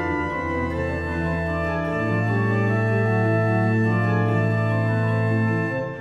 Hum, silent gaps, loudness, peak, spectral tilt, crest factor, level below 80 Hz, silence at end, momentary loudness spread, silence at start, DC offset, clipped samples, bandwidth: none; none; -22 LUFS; -10 dBFS; -9 dB/octave; 12 dB; -42 dBFS; 0 s; 5 LU; 0 s; under 0.1%; under 0.1%; 7.4 kHz